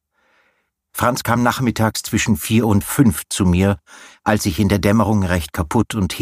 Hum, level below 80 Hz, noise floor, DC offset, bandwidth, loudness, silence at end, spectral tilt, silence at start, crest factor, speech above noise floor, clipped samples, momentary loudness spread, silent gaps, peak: none; -38 dBFS; -65 dBFS; under 0.1%; 15.5 kHz; -18 LUFS; 0 s; -5.5 dB/octave; 0.95 s; 18 dB; 48 dB; under 0.1%; 5 LU; none; 0 dBFS